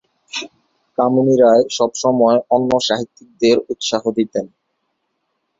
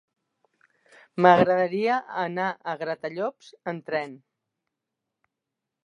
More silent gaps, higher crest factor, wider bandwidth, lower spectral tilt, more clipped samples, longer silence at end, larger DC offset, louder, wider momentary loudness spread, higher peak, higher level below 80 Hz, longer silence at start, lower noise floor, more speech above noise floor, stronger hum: neither; second, 16 dB vs 24 dB; about the same, 7.8 kHz vs 7.4 kHz; second, -4.5 dB/octave vs -7 dB/octave; neither; second, 1.1 s vs 1.7 s; neither; first, -16 LUFS vs -24 LUFS; about the same, 15 LU vs 17 LU; about the same, 0 dBFS vs -2 dBFS; first, -58 dBFS vs -72 dBFS; second, 0.35 s vs 1.15 s; second, -71 dBFS vs -85 dBFS; second, 56 dB vs 61 dB; neither